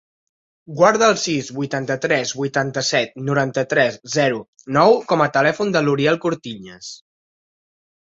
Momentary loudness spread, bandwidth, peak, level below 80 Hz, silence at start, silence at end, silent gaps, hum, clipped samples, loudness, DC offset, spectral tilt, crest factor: 14 LU; 8 kHz; -2 dBFS; -60 dBFS; 0.7 s; 1.05 s; 4.48-4.53 s; none; under 0.1%; -18 LUFS; under 0.1%; -4.5 dB/octave; 18 dB